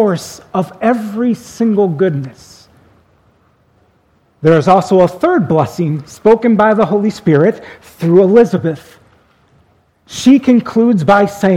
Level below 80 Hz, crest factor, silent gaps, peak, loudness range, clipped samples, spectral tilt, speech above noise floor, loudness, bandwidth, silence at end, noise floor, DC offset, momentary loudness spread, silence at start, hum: -50 dBFS; 12 dB; none; 0 dBFS; 6 LU; 0.2%; -7 dB/octave; 43 dB; -12 LUFS; 15 kHz; 0 s; -54 dBFS; under 0.1%; 11 LU; 0 s; none